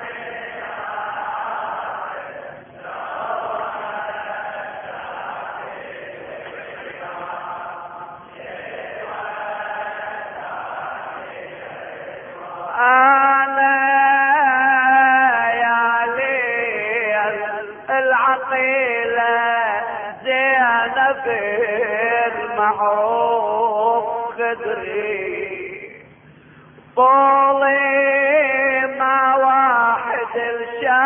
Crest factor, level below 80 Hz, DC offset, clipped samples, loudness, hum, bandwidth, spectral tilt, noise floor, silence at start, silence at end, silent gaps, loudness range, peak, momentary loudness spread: 16 dB; -64 dBFS; under 0.1%; under 0.1%; -18 LUFS; none; 3.6 kHz; -7 dB/octave; -46 dBFS; 0 s; 0 s; none; 15 LU; -4 dBFS; 19 LU